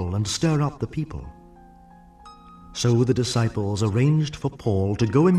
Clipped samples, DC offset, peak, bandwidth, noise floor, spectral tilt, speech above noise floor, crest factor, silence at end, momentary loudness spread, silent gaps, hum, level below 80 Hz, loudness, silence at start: under 0.1%; under 0.1%; -6 dBFS; 12.5 kHz; -49 dBFS; -6.5 dB/octave; 27 dB; 16 dB; 0 s; 12 LU; none; none; -46 dBFS; -23 LUFS; 0 s